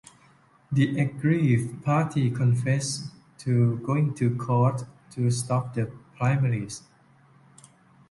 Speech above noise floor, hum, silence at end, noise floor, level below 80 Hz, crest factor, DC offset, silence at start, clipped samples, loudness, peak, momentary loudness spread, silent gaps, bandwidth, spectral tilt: 34 dB; none; 1.3 s; -58 dBFS; -60 dBFS; 16 dB; under 0.1%; 0.7 s; under 0.1%; -26 LUFS; -10 dBFS; 11 LU; none; 11.5 kHz; -6.5 dB/octave